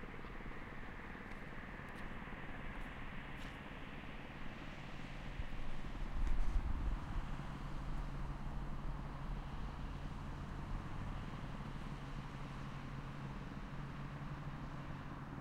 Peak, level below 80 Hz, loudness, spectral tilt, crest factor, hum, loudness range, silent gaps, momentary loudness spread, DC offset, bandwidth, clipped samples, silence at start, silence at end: -24 dBFS; -46 dBFS; -48 LUFS; -6.5 dB/octave; 18 dB; none; 4 LU; none; 6 LU; under 0.1%; 9.8 kHz; under 0.1%; 0 s; 0 s